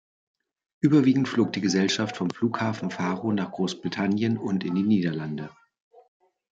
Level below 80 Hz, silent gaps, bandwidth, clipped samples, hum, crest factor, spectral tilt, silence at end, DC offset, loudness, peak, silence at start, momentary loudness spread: -68 dBFS; none; 8 kHz; under 0.1%; none; 18 dB; -6 dB/octave; 1.05 s; under 0.1%; -25 LUFS; -8 dBFS; 0.85 s; 8 LU